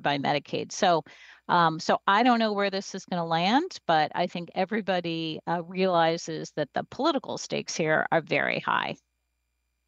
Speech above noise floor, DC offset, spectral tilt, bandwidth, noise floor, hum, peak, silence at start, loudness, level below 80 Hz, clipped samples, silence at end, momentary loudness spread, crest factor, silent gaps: 51 dB; under 0.1%; -4.5 dB/octave; 8.4 kHz; -78 dBFS; none; -8 dBFS; 0 s; -27 LUFS; -74 dBFS; under 0.1%; 0.95 s; 9 LU; 18 dB; none